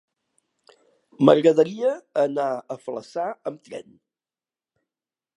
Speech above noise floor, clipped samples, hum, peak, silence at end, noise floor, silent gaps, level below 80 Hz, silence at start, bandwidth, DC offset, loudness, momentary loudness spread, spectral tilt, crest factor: over 68 dB; under 0.1%; none; -2 dBFS; 1.6 s; under -90 dBFS; none; -78 dBFS; 1.2 s; 10.5 kHz; under 0.1%; -22 LUFS; 19 LU; -7 dB/octave; 24 dB